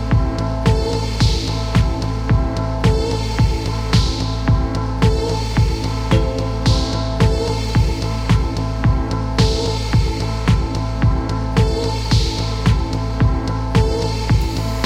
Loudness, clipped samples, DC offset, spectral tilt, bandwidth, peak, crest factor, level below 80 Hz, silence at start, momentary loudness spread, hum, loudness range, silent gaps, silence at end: -18 LUFS; under 0.1%; under 0.1%; -6 dB/octave; 12 kHz; -2 dBFS; 14 dB; -22 dBFS; 0 s; 4 LU; none; 1 LU; none; 0 s